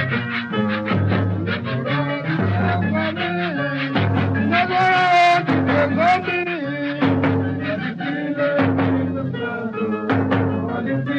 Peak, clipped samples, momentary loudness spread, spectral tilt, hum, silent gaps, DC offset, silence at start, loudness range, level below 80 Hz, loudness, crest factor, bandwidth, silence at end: -6 dBFS; under 0.1%; 8 LU; -7.5 dB/octave; none; none; under 0.1%; 0 s; 4 LU; -56 dBFS; -20 LUFS; 14 dB; 8.2 kHz; 0 s